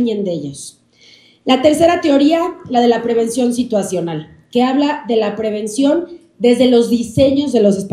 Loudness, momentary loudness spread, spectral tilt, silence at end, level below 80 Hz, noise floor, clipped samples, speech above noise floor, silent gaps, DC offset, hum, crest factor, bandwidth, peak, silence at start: -15 LUFS; 12 LU; -5.5 dB/octave; 0 s; -50 dBFS; -47 dBFS; under 0.1%; 33 dB; none; under 0.1%; none; 14 dB; 13.5 kHz; 0 dBFS; 0 s